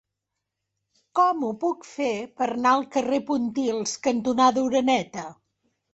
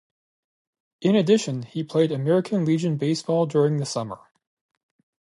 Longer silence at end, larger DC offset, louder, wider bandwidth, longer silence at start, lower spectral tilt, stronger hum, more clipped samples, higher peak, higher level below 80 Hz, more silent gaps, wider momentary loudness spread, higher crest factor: second, 0.6 s vs 1.05 s; neither; about the same, -24 LUFS vs -23 LUFS; second, 8.2 kHz vs 11.5 kHz; first, 1.15 s vs 1 s; second, -4 dB/octave vs -6.5 dB/octave; neither; neither; about the same, -8 dBFS vs -6 dBFS; about the same, -66 dBFS vs -70 dBFS; neither; about the same, 8 LU vs 10 LU; about the same, 18 dB vs 18 dB